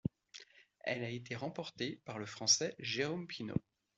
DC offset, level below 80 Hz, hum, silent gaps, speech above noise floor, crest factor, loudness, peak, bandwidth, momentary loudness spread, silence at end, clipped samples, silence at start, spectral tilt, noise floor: under 0.1%; -72 dBFS; none; none; 20 dB; 22 dB; -38 LUFS; -18 dBFS; 8.2 kHz; 15 LU; 0.4 s; under 0.1%; 0.05 s; -3 dB/octave; -59 dBFS